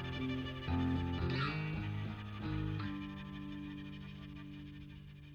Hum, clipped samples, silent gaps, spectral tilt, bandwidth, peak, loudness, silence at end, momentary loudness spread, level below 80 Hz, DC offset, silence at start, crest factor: none; under 0.1%; none; -8 dB/octave; 7 kHz; -24 dBFS; -41 LUFS; 0 s; 13 LU; -52 dBFS; under 0.1%; 0 s; 16 dB